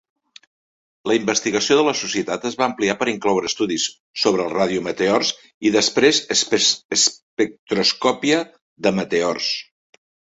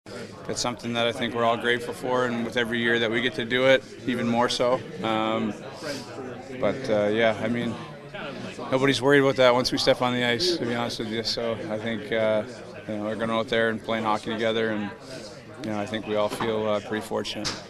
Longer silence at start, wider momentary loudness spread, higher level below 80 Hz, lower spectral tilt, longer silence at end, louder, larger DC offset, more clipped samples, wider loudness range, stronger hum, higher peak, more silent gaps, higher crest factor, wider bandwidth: first, 1.05 s vs 0.05 s; second, 7 LU vs 14 LU; about the same, -60 dBFS vs -56 dBFS; second, -2.5 dB/octave vs -4.5 dB/octave; first, 0.75 s vs 0 s; first, -19 LUFS vs -25 LUFS; neither; neither; about the same, 3 LU vs 5 LU; neither; about the same, -2 dBFS vs -4 dBFS; first, 4.00-4.14 s, 5.54-5.61 s, 6.85-6.89 s, 7.22-7.37 s, 7.59-7.67 s, 8.61-8.76 s vs none; about the same, 18 dB vs 22 dB; second, 8.2 kHz vs 14 kHz